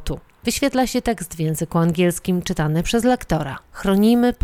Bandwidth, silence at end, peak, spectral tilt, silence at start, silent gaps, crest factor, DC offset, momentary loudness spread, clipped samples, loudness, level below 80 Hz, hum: 17.5 kHz; 0.1 s; -4 dBFS; -5.5 dB/octave; 0 s; none; 14 dB; under 0.1%; 9 LU; under 0.1%; -20 LUFS; -38 dBFS; none